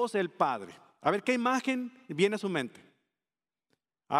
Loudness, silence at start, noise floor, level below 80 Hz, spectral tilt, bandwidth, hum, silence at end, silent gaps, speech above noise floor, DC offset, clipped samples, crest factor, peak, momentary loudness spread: -31 LUFS; 0 s; under -90 dBFS; -80 dBFS; -5 dB/octave; 13.5 kHz; none; 0 s; none; over 59 dB; under 0.1%; under 0.1%; 22 dB; -10 dBFS; 11 LU